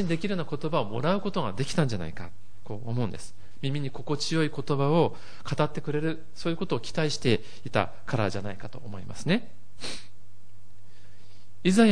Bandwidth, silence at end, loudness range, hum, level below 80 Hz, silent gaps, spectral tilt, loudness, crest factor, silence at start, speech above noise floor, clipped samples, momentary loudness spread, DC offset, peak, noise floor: 10.5 kHz; 0 s; 5 LU; none; -54 dBFS; none; -6 dB/octave; -29 LUFS; 22 dB; 0 s; 28 dB; under 0.1%; 15 LU; 3%; -6 dBFS; -56 dBFS